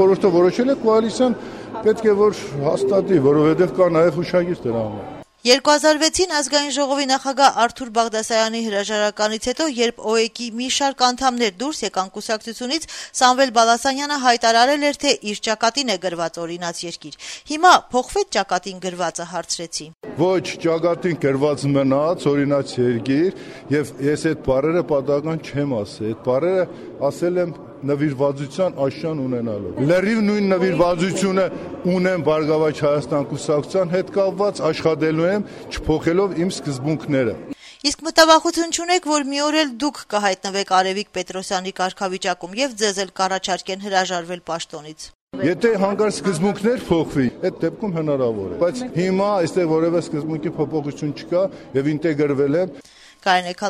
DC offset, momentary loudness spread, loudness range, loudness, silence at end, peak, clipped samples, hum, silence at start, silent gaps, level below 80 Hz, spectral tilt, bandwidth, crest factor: under 0.1%; 10 LU; 5 LU; -20 LUFS; 0 s; 0 dBFS; under 0.1%; none; 0 s; 45.15-45.27 s; -50 dBFS; -4.5 dB/octave; 14.5 kHz; 20 dB